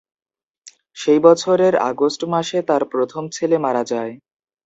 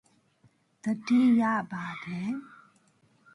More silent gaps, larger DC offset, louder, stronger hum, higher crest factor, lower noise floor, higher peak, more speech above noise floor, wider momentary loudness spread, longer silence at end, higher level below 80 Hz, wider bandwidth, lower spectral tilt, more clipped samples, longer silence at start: neither; neither; first, -18 LUFS vs -28 LUFS; neither; about the same, 18 dB vs 14 dB; second, -48 dBFS vs -66 dBFS; first, 0 dBFS vs -14 dBFS; second, 31 dB vs 39 dB; second, 11 LU vs 14 LU; second, 0.5 s vs 0.9 s; first, -66 dBFS vs -74 dBFS; second, 8 kHz vs 11 kHz; second, -5 dB/octave vs -6.5 dB/octave; neither; second, 0.65 s vs 0.85 s